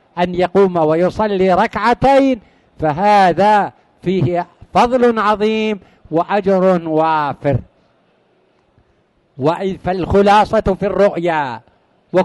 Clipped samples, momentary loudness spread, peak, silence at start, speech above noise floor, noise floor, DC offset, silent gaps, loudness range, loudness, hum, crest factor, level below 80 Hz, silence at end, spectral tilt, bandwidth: under 0.1%; 10 LU; -2 dBFS; 0.15 s; 44 dB; -58 dBFS; under 0.1%; none; 5 LU; -15 LUFS; none; 14 dB; -40 dBFS; 0 s; -7 dB/octave; 11.5 kHz